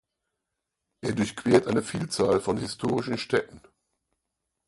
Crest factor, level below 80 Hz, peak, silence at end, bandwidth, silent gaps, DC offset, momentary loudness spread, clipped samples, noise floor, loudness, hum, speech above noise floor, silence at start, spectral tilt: 24 dB; -58 dBFS; -4 dBFS; 1.1 s; 11.5 kHz; none; under 0.1%; 9 LU; under 0.1%; -84 dBFS; -26 LUFS; none; 58 dB; 1.05 s; -5.5 dB/octave